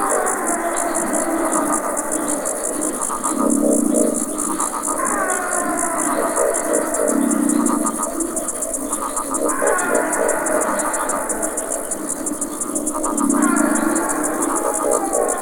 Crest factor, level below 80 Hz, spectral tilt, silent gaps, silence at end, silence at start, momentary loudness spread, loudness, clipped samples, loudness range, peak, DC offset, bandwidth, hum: 18 dB; -46 dBFS; -3 dB/octave; none; 0 s; 0 s; 5 LU; -19 LUFS; under 0.1%; 1 LU; -2 dBFS; under 0.1%; over 20 kHz; none